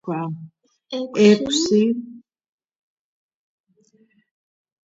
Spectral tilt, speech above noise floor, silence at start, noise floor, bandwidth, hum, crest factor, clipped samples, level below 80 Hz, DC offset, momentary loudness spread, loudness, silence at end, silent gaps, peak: -5 dB/octave; 41 dB; 0.05 s; -60 dBFS; 8 kHz; none; 22 dB; under 0.1%; -64 dBFS; under 0.1%; 18 LU; -19 LUFS; 2.7 s; none; -2 dBFS